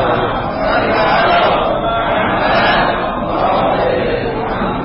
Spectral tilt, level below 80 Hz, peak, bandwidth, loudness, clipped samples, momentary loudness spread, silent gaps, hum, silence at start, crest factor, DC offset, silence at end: -10 dB/octave; -32 dBFS; -2 dBFS; 5.8 kHz; -14 LUFS; under 0.1%; 6 LU; none; none; 0 s; 12 dB; under 0.1%; 0 s